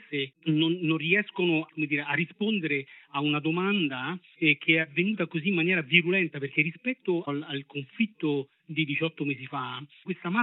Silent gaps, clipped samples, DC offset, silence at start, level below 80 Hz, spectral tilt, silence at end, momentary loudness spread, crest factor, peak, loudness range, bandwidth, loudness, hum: none; under 0.1%; under 0.1%; 0.1 s; under -90 dBFS; -9.5 dB/octave; 0 s; 11 LU; 24 dB; -4 dBFS; 5 LU; 4.1 kHz; -27 LUFS; none